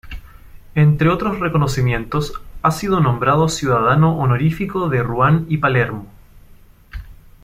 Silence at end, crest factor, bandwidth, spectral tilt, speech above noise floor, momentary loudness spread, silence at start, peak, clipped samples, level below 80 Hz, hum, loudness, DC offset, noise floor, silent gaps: 0.3 s; 16 dB; 15 kHz; -7 dB/octave; 29 dB; 18 LU; 0.05 s; -2 dBFS; under 0.1%; -36 dBFS; none; -17 LUFS; under 0.1%; -45 dBFS; none